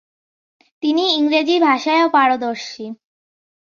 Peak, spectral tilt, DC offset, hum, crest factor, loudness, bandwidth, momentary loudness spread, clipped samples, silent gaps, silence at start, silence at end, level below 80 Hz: -2 dBFS; -3 dB/octave; under 0.1%; none; 16 dB; -16 LUFS; 7.2 kHz; 15 LU; under 0.1%; none; 0.85 s; 0.75 s; -70 dBFS